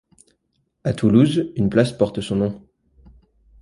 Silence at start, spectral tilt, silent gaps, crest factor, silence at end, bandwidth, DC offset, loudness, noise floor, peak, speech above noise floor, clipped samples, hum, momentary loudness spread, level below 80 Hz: 0.85 s; -7.5 dB/octave; none; 18 dB; 1.05 s; 11.5 kHz; under 0.1%; -20 LUFS; -70 dBFS; -2 dBFS; 52 dB; under 0.1%; none; 11 LU; -48 dBFS